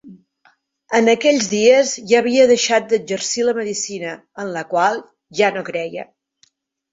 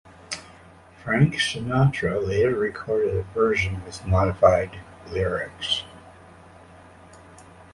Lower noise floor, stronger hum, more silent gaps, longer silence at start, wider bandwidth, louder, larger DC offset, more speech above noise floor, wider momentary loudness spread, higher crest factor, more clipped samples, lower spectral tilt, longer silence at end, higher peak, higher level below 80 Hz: first, -60 dBFS vs -49 dBFS; neither; neither; second, 0.05 s vs 0.3 s; second, 8 kHz vs 11.5 kHz; first, -17 LUFS vs -23 LUFS; neither; first, 43 dB vs 26 dB; about the same, 15 LU vs 16 LU; second, 16 dB vs 22 dB; neither; second, -3 dB/octave vs -5.5 dB/octave; first, 0.9 s vs 0.3 s; about the same, -2 dBFS vs -2 dBFS; second, -66 dBFS vs -42 dBFS